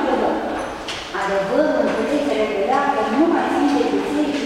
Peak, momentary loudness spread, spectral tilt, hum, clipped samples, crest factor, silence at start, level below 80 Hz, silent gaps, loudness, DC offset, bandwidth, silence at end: -6 dBFS; 8 LU; -5 dB/octave; none; under 0.1%; 14 dB; 0 s; -48 dBFS; none; -20 LUFS; under 0.1%; 13 kHz; 0 s